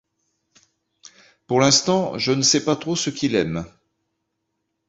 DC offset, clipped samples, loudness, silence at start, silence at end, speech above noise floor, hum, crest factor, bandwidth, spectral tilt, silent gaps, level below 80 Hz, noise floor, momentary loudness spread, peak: under 0.1%; under 0.1%; -19 LUFS; 1.5 s; 1.2 s; 56 dB; none; 20 dB; 8.2 kHz; -3.5 dB/octave; none; -56 dBFS; -76 dBFS; 10 LU; -2 dBFS